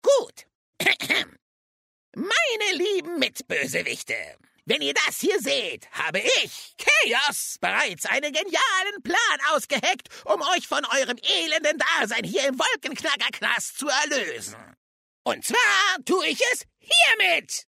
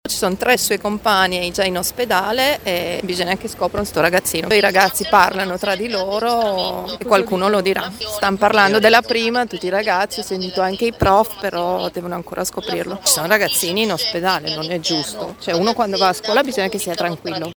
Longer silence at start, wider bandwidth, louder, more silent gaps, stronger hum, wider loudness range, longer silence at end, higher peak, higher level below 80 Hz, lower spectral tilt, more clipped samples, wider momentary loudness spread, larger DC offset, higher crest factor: about the same, 0.05 s vs 0.05 s; second, 16 kHz vs over 20 kHz; second, -22 LUFS vs -17 LUFS; first, 0.55-0.73 s, 1.42-2.12 s, 14.77-15.25 s vs none; neither; about the same, 3 LU vs 3 LU; about the same, 0.1 s vs 0.05 s; second, -4 dBFS vs 0 dBFS; second, -74 dBFS vs -46 dBFS; second, -1 dB/octave vs -3 dB/octave; neither; about the same, 10 LU vs 8 LU; neither; about the same, 20 dB vs 18 dB